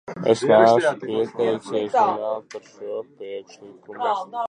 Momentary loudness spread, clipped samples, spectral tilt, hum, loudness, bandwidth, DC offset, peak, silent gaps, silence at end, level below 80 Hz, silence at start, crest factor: 20 LU; under 0.1%; -5.5 dB/octave; none; -20 LUFS; 10 kHz; under 0.1%; -2 dBFS; none; 0 s; -70 dBFS; 0.1 s; 20 dB